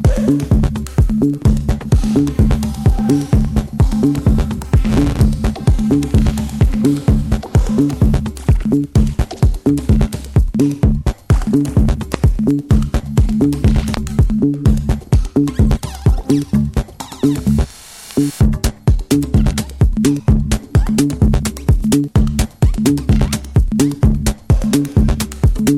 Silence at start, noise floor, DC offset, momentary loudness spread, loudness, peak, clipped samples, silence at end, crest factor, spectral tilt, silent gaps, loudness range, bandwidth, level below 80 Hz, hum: 0 s; -35 dBFS; under 0.1%; 4 LU; -16 LUFS; 0 dBFS; under 0.1%; 0 s; 12 dB; -7 dB/octave; none; 1 LU; 15.5 kHz; -18 dBFS; none